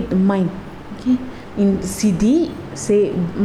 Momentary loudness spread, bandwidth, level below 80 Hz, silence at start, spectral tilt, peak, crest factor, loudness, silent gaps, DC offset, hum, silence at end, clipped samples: 11 LU; 13 kHz; -40 dBFS; 0 s; -6.5 dB/octave; -6 dBFS; 12 dB; -19 LUFS; none; under 0.1%; none; 0 s; under 0.1%